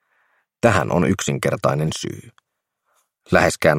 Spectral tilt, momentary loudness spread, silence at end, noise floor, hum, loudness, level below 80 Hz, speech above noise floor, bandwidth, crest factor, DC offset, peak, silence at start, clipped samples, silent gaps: -5 dB/octave; 11 LU; 0 s; -72 dBFS; none; -19 LUFS; -48 dBFS; 53 dB; 16.5 kHz; 20 dB; under 0.1%; 0 dBFS; 0.65 s; under 0.1%; none